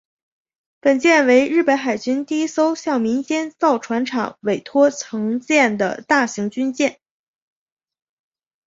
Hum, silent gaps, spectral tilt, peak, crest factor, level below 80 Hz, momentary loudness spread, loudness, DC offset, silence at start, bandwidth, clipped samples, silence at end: none; none; -4 dB/octave; -2 dBFS; 18 dB; -66 dBFS; 9 LU; -18 LUFS; under 0.1%; 0.85 s; 8 kHz; under 0.1%; 1.75 s